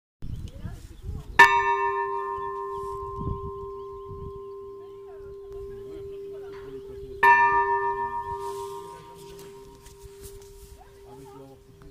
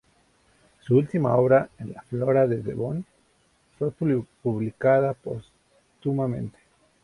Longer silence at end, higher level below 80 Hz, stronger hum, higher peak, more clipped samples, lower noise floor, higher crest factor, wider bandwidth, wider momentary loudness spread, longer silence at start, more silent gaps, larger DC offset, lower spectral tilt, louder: second, 0 s vs 0.55 s; first, -48 dBFS vs -58 dBFS; neither; first, 0 dBFS vs -8 dBFS; neither; second, -48 dBFS vs -64 dBFS; first, 28 dB vs 18 dB; first, 15.5 kHz vs 11 kHz; first, 27 LU vs 15 LU; second, 0.2 s vs 0.85 s; neither; neither; second, -4 dB/octave vs -10 dB/octave; about the same, -23 LUFS vs -25 LUFS